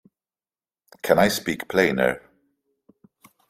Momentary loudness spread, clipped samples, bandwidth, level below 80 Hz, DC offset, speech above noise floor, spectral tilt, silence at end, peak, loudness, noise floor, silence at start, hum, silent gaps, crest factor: 12 LU; under 0.1%; 16 kHz; -56 dBFS; under 0.1%; over 69 dB; -4.5 dB/octave; 1.3 s; -2 dBFS; -22 LUFS; under -90 dBFS; 1.05 s; none; none; 24 dB